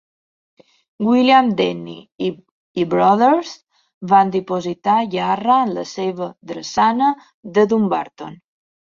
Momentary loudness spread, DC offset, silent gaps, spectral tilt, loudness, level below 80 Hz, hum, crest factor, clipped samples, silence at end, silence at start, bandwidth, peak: 17 LU; under 0.1%; 2.51-2.75 s, 3.94-4.01 s, 7.34-7.43 s; -6 dB/octave; -17 LUFS; -62 dBFS; none; 16 dB; under 0.1%; 0.45 s; 1 s; 7.4 kHz; -2 dBFS